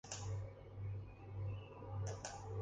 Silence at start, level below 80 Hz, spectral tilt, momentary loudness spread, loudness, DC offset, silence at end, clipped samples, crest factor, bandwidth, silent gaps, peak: 0.05 s; -58 dBFS; -5 dB/octave; 5 LU; -48 LUFS; under 0.1%; 0 s; under 0.1%; 18 dB; 9.6 kHz; none; -28 dBFS